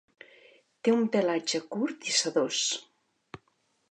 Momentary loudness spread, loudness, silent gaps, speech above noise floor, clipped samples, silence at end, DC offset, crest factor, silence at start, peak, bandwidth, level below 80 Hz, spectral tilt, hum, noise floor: 6 LU; -28 LUFS; none; 44 dB; under 0.1%; 1.1 s; under 0.1%; 18 dB; 0.85 s; -12 dBFS; 11 kHz; -76 dBFS; -2.5 dB/octave; none; -72 dBFS